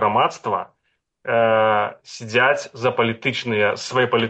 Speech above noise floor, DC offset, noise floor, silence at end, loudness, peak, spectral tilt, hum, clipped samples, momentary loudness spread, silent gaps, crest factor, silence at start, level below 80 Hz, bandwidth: 52 dB; under 0.1%; -71 dBFS; 0 s; -20 LUFS; -6 dBFS; -4.5 dB/octave; none; under 0.1%; 10 LU; none; 14 dB; 0 s; -64 dBFS; 8.6 kHz